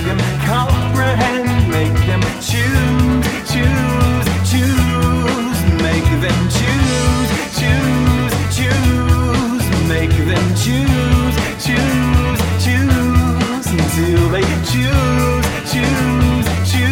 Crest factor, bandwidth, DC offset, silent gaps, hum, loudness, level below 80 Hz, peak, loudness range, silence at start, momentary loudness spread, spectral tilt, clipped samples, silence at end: 12 dB; 17 kHz; under 0.1%; none; none; -15 LUFS; -22 dBFS; -2 dBFS; 0 LU; 0 s; 3 LU; -5.5 dB/octave; under 0.1%; 0 s